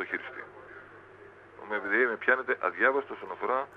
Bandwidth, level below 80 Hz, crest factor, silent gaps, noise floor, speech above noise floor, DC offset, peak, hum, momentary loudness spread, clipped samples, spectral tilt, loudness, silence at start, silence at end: 5.8 kHz; -74 dBFS; 22 dB; none; -52 dBFS; 23 dB; under 0.1%; -10 dBFS; none; 22 LU; under 0.1%; -6 dB/octave; -29 LUFS; 0 s; 0 s